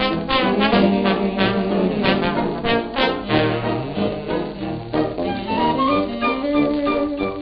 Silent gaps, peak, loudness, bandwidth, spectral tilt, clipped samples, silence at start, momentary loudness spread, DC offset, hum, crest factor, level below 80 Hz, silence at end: none; -4 dBFS; -20 LUFS; 5.6 kHz; -9 dB/octave; under 0.1%; 0 s; 7 LU; under 0.1%; none; 16 dB; -42 dBFS; 0 s